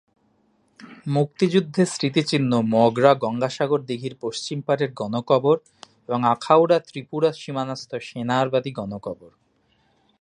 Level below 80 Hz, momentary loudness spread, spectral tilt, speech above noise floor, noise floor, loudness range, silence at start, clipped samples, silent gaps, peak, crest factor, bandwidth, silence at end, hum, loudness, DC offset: -66 dBFS; 13 LU; -6 dB/octave; 43 dB; -64 dBFS; 3 LU; 0.8 s; under 0.1%; none; -2 dBFS; 22 dB; 11 kHz; 0.95 s; none; -22 LUFS; under 0.1%